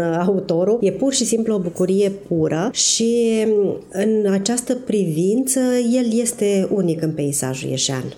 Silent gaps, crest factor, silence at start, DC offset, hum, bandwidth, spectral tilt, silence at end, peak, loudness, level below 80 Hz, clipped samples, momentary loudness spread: none; 14 dB; 0 s; under 0.1%; none; over 20 kHz; -4.5 dB/octave; 0 s; -4 dBFS; -19 LUFS; -58 dBFS; under 0.1%; 4 LU